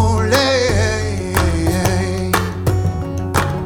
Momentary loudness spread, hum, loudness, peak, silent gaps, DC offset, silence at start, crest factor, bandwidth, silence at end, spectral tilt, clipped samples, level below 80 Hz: 5 LU; none; -17 LUFS; 0 dBFS; none; under 0.1%; 0 s; 16 dB; 19 kHz; 0 s; -5 dB/octave; under 0.1%; -28 dBFS